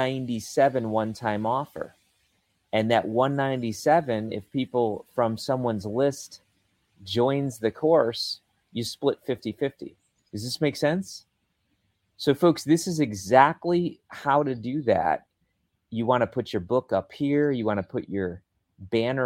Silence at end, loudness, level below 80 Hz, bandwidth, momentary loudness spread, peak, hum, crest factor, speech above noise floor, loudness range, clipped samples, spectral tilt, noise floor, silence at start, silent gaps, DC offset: 0 s; -26 LUFS; -64 dBFS; 16.5 kHz; 12 LU; -4 dBFS; none; 22 dB; 49 dB; 5 LU; under 0.1%; -5.5 dB/octave; -74 dBFS; 0 s; none; under 0.1%